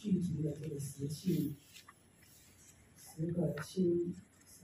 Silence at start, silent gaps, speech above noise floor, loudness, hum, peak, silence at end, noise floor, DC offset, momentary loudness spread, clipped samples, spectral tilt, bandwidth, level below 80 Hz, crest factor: 0 s; none; 26 dB; -38 LUFS; none; -22 dBFS; 0.05 s; -63 dBFS; under 0.1%; 22 LU; under 0.1%; -7 dB/octave; 15.5 kHz; -70 dBFS; 16 dB